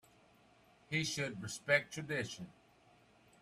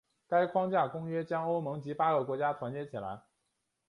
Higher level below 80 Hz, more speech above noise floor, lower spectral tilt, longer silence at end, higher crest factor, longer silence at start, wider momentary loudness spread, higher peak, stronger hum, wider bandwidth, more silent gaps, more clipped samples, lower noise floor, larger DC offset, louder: about the same, -74 dBFS vs -74 dBFS; second, 29 dB vs 50 dB; second, -3.5 dB/octave vs -8.5 dB/octave; first, 0.9 s vs 0.7 s; first, 24 dB vs 18 dB; first, 0.9 s vs 0.3 s; about the same, 13 LU vs 11 LU; about the same, -18 dBFS vs -16 dBFS; neither; first, 15 kHz vs 10.5 kHz; neither; neither; second, -67 dBFS vs -82 dBFS; neither; second, -37 LUFS vs -33 LUFS